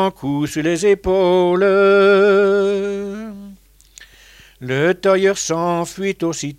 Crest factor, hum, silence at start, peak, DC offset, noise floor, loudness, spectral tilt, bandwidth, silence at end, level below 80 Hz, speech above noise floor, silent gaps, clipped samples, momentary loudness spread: 14 dB; none; 0 s; -4 dBFS; under 0.1%; -46 dBFS; -16 LUFS; -5 dB/octave; 13.5 kHz; 0.05 s; -46 dBFS; 30 dB; none; under 0.1%; 14 LU